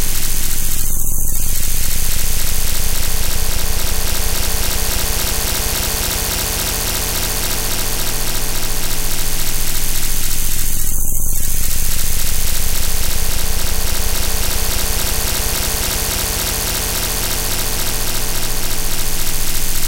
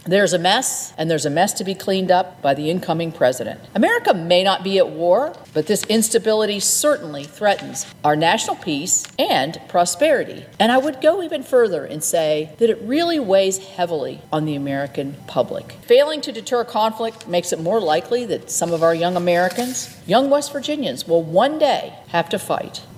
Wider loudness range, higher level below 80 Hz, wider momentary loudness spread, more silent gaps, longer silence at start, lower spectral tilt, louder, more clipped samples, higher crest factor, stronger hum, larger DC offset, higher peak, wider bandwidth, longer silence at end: about the same, 1 LU vs 3 LU; first, -18 dBFS vs -64 dBFS; second, 2 LU vs 8 LU; neither; about the same, 0 s vs 0.05 s; second, -2 dB/octave vs -3.5 dB/octave; about the same, -18 LUFS vs -19 LUFS; neither; second, 12 dB vs 18 dB; neither; neither; about the same, -2 dBFS vs -2 dBFS; about the same, 16 kHz vs 16.5 kHz; about the same, 0 s vs 0 s